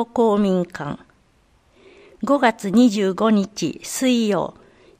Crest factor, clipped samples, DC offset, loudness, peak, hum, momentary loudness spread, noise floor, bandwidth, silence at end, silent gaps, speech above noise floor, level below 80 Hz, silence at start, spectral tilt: 18 dB; under 0.1%; under 0.1%; -20 LUFS; -2 dBFS; none; 14 LU; -58 dBFS; 15.5 kHz; 0.5 s; none; 40 dB; -58 dBFS; 0 s; -5.5 dB/octave